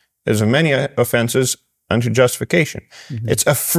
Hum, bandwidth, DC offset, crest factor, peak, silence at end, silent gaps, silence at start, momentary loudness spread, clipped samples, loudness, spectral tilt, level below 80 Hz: none; 16 kHz; under 0.1%; 16 dB; -2 dBFS; 0 s; none; 0.25 s; 10 LU; under 0.1%; -17 LUFS; -4.5 dB/octave; -46 dBFS